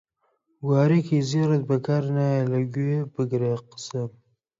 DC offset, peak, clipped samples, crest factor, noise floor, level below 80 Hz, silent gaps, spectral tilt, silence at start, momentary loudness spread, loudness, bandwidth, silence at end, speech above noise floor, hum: under 0.1%; -8 dBFS; under 0.1%; 16 dB; -71 dBFS; -68 dBFS; none; -7.5 dB/octave; 0.6 s; 12 LU; -24 LUFS; 7.6 kHz; 0.5 s; 48 dB; none